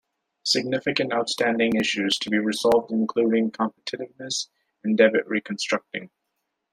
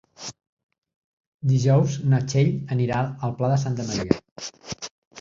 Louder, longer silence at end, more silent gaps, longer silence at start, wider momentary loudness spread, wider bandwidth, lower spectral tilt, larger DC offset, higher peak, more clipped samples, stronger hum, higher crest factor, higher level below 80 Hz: about the same, -23 LUFS vs -23 LUFS; first, 0.65 s vs 0 s; second, none vs 0.49-0.57 s, 0.64-0.69 s, 0.78-0.82 s, 0.96-1.39 s, 4.31-4.36 s, 4.91-5.11 s; first, 0.45 s vs 0.2 s; second, 13 LU vs 17 LU; first, 14 kHz vs 7.6 kHz; second, -3.5 dB/octave vs -6.5 dB/octave; neither; about the same, -4 dBFS vs -2 dBFS; neither; neither; about the same, 20 dB vs 22 dB; second, -66 dBFS vs -54 dBFS